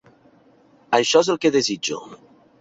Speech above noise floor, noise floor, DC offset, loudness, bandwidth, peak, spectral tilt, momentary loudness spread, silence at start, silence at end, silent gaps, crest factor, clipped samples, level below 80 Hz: 35 dB; -55 dBFS; under 0.1%; -19 LUFS; 8 kHz; -2 dBFS; -3 dB/octave; 10 LU; 0.9 s; 0.45 s; none; 20 dB; under 0.1%; -66 dBFS